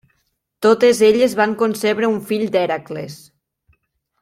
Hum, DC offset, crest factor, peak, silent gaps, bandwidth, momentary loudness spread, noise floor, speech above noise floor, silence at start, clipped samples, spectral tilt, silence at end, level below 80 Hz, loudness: none; under 0.1%; 16 dB; -2 dBFS; none; 16 kHz; 14 LU; -69 dBFS; 53 dB; 0.6 s; under 0.1%; -4.5 dB/octave; 1.05 s; -62 dBFS; -16 LUFS